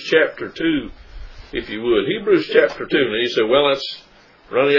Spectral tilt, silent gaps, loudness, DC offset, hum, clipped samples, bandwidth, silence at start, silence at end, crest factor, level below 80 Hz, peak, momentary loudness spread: -5.5 dB/octave; none; -19 LUFS; under 0.1%; none; under 0.1%; 6 kHz; 0 s; 0 s; 18 dB; -44 dBFS; 0 dBFS; 13 LU